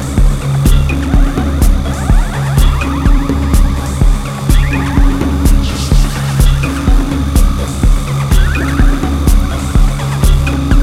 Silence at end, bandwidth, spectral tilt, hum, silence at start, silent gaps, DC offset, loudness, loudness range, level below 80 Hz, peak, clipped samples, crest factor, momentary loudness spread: 0 s; 15 kHz; -6 dB/octave; none; 0 s; none; under 0.1%; -13 LUFS; 0 LU; -12 dBFS; 0 dBFS; 0.3%; 10 dB; 2 LU